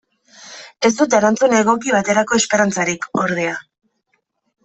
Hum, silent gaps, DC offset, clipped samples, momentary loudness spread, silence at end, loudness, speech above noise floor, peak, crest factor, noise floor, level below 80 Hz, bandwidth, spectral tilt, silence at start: none; none; under 0.1%; under 0.1%; 14 LU; 1.05 s; -16 LUFS; 52 dB; -2 dBFS; 16 dB; -68 dBFS; -60 dBFS; 8.4 kHz; -3.5 dB/octave; 0.4 s